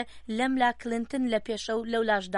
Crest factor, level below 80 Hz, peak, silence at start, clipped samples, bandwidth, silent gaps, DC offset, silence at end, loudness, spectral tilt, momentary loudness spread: 16 dB; -58 dBFS; -12 dBFS; 0 s; under 0.1%; 11.5 kHz; none; under 0.1%; 0 s; -28 LUFS; -4 dB/octave; 6 LU